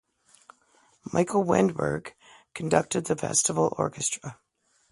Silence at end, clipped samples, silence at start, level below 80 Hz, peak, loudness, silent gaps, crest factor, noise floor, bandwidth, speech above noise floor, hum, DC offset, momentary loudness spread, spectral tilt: 0.6 s; under 0.1%; 1.05 s; -60 dBFS; -6 dBFS; -26 LUFS; none; 22 dB; -64 dBFS; 11.5 kHz; 38 dB; none; under 0.1%; 17 LU; -4.5 dB/octave